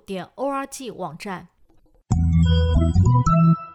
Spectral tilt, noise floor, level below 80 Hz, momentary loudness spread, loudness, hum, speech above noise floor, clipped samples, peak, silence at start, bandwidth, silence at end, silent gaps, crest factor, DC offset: -7.5 dB/octave; -55 dBFS; -30 dBFS; 16 LU; -20 LUFS; none; 35 dB; under 0.1%; -8 dBFS; 0.1 s; 12 kHz; 0 s; none; 12 dB; under 0.1%